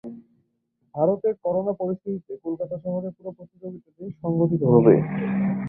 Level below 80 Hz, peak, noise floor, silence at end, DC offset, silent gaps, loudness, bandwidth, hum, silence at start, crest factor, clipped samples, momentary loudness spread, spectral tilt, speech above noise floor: -60 dBFS; -4 dBFS; -71 dBFS; 0 s; under 0.1%; none; -23 LUFS; 3.5 kHz; none; 0.05 s; 20 dB; under 0.1%; 22 LU; -13.5 dB/octave; 48 dB